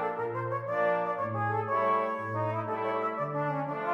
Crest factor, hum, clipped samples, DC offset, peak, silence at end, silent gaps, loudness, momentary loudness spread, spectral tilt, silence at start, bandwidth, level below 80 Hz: 14 dB; none; under 0.1%; under 0.1%; -16 dBFS; 0 s; none; -31 LUFS; 5 LU; -8.5 dB/octave; 0 s; 7.6 kHz; -78 dBFS